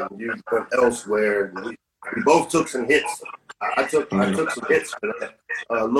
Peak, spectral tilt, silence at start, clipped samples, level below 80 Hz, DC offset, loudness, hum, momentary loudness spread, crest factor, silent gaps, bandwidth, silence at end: -2 dBFS; -4.5 dB/octave; 0 s; under 0.1%; -60 dBFS; under 0.1%; -22 LUFS; none; 13 LU; 20 dB; none; 13.5 kHz; 0 s